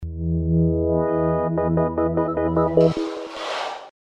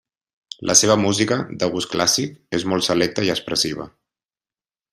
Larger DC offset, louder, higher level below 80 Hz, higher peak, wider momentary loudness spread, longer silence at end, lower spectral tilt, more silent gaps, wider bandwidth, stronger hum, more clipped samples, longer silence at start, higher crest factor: neither; second, -22 LUFS vs -19 LUFS; first, -36 dBFS vs -58 dBFS; second, -4 dBFS vs 0 dBFS; about the same, 10 LU vs 12 LU; second, 0.1 s vs 1.05 s; first, -8 dB/octave vs -3 dB/octave; neither; second, 8.4 kHz vs 15.5 kHz; neither; neither; second, 0 s vs 0.6 s; second, 16 dB vs 22 dB